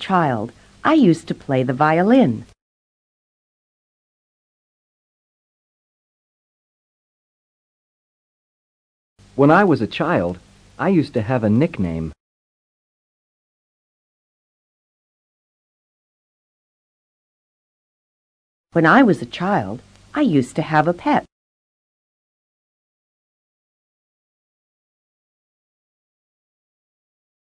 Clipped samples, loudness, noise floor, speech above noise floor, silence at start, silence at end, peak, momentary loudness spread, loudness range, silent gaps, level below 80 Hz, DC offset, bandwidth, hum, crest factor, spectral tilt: under 0.1%; -18 LUFS; under -90 dBFS; over 73 dB; 0 s; 6.3 s; -2 dBFS; 15 LU; 8 LU; 2.62-9.16 s, 12.20-18.64 s; -54 dBFS; under 0.1%; 10.5 kHz; none; 22 dB; -7.5 dB/octave